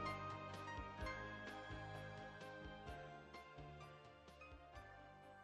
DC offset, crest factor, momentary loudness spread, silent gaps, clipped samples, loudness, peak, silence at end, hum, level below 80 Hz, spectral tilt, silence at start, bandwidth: under 0.1%; 18 dB; 11 LU; none; under 0.1%; -54 LUFS; -34 dBFS; 0 s; none; -64 dBFS; -5.5 dB/octave; 0 s; 12.5 kHz